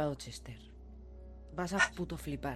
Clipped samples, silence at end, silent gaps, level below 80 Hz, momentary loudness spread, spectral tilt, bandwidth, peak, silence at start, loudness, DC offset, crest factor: under 0.1%; 0 s; none; -52 dBFS; 22 LU; -4.5 dB/octave; 15 kHz; -14 dBFS; 0 s; -36 LUFS; under 0.1%; 24 dB